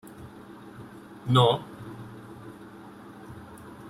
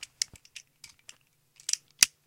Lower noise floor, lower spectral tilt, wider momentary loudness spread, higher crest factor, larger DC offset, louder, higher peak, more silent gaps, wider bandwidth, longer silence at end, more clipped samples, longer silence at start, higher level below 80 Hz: second, -46 dBFS vs -62 dBFS; first, -6.5 dB/octave vs 3 dB/octave; about the same, 24 LU vs 26 LU; second, 24 dB vs 34 dB; neither; first, -24 LUFS vs -29 LUFS; second, -6 dBFS vs 0 dBFS; neither; second, 14 kHz vs 16.5 kHz; second, 0 s vs 0.2 s; neither; second, 0.05 s vs 1.7 s; first, -62 dBFS vs -70 dBFS